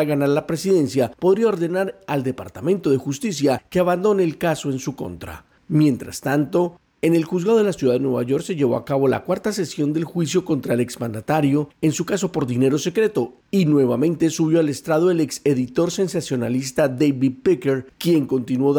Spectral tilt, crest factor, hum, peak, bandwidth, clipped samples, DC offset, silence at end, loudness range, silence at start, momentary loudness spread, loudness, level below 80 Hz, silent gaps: -6 dB/octave; 12 dB; none; -8 dBFS; 19.5 kHz; under 0.1%; under 0.1%; 0 s; 2 LU; 0 s; 6 LU; -20 LUFS; -56 dBFS; none